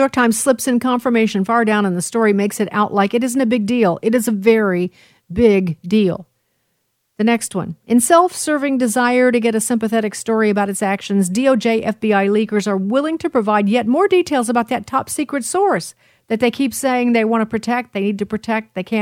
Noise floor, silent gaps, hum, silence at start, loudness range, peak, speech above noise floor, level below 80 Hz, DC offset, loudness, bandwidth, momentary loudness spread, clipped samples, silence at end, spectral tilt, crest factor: -69 dBFS; none; none; 0 s; 2 LU; 0 dBFS; 52 dB; -52 dBFS; under 0.1%; -17 LUFS; 16.5 kHz; 7 LU; under 0.1%; 0 s; -5 dB/octave; 16 dB